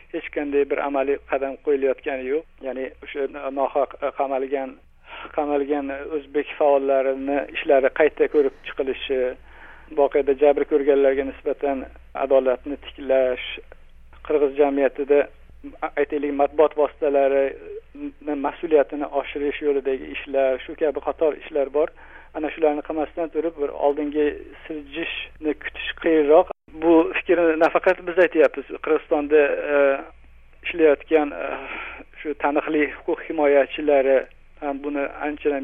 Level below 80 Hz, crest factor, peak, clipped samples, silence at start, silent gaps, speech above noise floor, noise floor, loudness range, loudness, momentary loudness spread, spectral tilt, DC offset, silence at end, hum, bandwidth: -48 dBFS; 18 dB; -4 dBFS; under 0.1%; 0.15 s; none; 23 dB; -45 dBFS; 6 LU; -22 LUFS; 12 LU; -7 dB/octave; under 0.1%; 0 s; none; 4 kHz